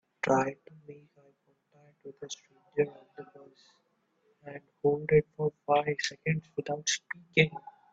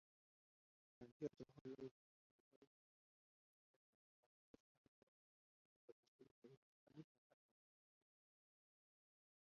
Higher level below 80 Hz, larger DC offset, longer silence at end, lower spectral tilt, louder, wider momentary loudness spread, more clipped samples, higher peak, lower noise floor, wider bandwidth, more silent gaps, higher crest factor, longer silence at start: first, -66 dBFS vs under -90 dBFS; neither; second, 0.2 s vs 2.4 s; second, -4.5 dB/octave vs -7.5 dB/octave; first, -30 LUFS vs -58 LUFS; first, 24 LU vs 14 LU; neither; first, -10 dBFS vs -36 dBFS; second, -72 dBFS vs under -90 dBFS; first, 8 kHz vs 6.6 kHz; second, none vs 1.12-1.20 s, 1.61-1.65 s, 1.91-4.54 s, 4.60-6.19 s, 6.31-6.42 s, 6.57-6.87 s; about the same, 24 dB vs 28 dB; second, 0.25 s vs 1 s